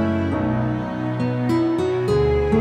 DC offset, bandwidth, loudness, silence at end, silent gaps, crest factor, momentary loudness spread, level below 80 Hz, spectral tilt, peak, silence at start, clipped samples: under 0.1%; 11.5 kHz; -21 LUFS; 0 s; none; 14 dB; 5 LU; -34 dBFS; -8.5 dB/octave; -6 dBFS; 0 s; under 0.1%